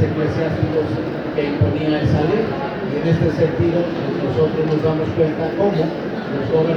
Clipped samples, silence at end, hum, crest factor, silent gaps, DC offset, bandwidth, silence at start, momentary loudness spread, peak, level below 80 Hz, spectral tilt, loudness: under 0.1%; 0 s; none; 14 dB; none; under 0.1%; 6.8 kHz; 0 s; 5 LU; -4 dBFS; -42 dBFS; -8.5 dB/octave; -19 LUFS